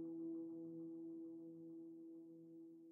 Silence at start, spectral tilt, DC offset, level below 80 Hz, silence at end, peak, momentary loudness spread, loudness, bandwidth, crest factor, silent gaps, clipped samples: 0 s; -7.5 dB/octave; under 0.1%; under -90 dBFS; 0 s; -42 dBFS; 11 LU; -54 LUFS; 1.4 kHz; 10 dB; none; under 0.1%